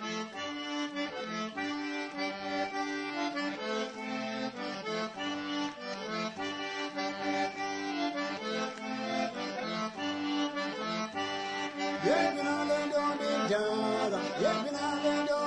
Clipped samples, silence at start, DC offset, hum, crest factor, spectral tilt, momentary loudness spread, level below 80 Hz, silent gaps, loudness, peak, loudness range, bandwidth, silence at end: under 0.1%; 0 s; under 0.1%; none; 18 dB; -4 dB/octave; 7 LU; -72 dBFS; none; -33 LUFS; -16 dBFS; 5 LU; 10 kHz; 0 s